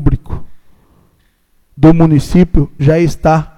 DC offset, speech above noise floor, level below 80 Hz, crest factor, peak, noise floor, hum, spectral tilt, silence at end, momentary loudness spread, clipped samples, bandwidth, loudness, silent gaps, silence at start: under 0.1%; 45 dB; -22 dBFS; 12 dB; 0 dBFS; -54 dBFS; none; -8.5 dB/octave; 0.1 s; 13 LU; 0.5%; 12.5 kHz; -11 LUFS; none; 0 s